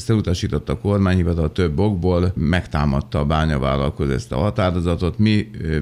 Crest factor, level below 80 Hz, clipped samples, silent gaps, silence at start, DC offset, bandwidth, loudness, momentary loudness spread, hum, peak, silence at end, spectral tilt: 16 dB; -30 dBFS; under 0.1%; none; 0 s; under 0.1%; 11.5 kHz; -20 LUFS; 4 LU; none; -2 dBFS; 0 s; -7.5 dB/octave